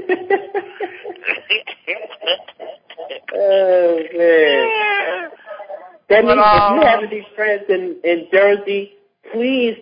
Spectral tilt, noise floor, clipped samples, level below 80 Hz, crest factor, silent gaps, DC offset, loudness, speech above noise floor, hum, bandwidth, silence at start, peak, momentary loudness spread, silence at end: -9 dB/octave; -35 dBFS; under 0.1%; -48 dBFS; 16 dB; none; under 0.1%; -16 LUFS; 21 dB; none; 5.2 kHz; 0 s; 0 dBFS; 21 LU; 0.05 s